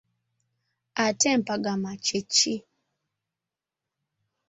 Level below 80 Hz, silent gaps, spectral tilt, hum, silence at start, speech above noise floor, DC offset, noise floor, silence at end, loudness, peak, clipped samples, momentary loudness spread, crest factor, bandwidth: -72 dBFS; none; -2.5 dB/octave; none; 0.95 s; 63 dB; under 0.1%; -88 dBFS; 1.9 s; -25 LUFS; -8 dBFS; under 0.1%; 8 LU; 22 dB; 8.2 kHz